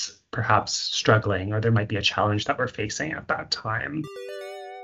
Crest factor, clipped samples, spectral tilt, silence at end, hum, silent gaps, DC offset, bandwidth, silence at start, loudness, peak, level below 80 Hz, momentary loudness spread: 22 dB; under 0.1%; -4.5 dB/octave; 0 s; none; none; under 0.1%; 8.2 kHz; 0 s; -25 LUFS; -2 dBFS; -56 dBFS; 14 LU